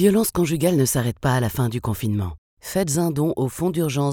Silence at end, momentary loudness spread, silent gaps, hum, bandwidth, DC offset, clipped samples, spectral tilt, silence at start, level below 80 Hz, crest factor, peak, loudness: 0 s; 7 LU; 2.38-2.57 s; none; 19.5 kHz; under 0.1%; under 0.1%; -5.5 dB/octave; 0 s; -44 dBFS; 16 dB; -4 dBFS; -22 LUFS